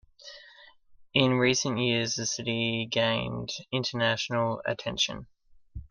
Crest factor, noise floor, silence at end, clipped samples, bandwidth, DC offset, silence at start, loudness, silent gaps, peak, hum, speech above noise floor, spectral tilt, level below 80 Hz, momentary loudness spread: 24 dB; -55 dBFS; 0.05 s; under 0.1%; 10.5 kHz; under 0.1%; 0.2 s; -27 LUFS; none; -6 dBFS; none; 27 dB; -3.5 dB/octave; -56 dBFS; 21 LU